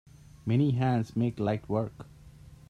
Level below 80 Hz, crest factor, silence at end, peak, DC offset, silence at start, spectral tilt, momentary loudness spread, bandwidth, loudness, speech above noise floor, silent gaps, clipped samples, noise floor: -58 dBFS; 16 dB; 0.15 s; -16 dBFS; under 0.1%; 0.45 s; -9 dB/octave; 15 LU; 9.8 kHz; -29 LUFS; 23 dB; none; under 0.1%; -51 dBFS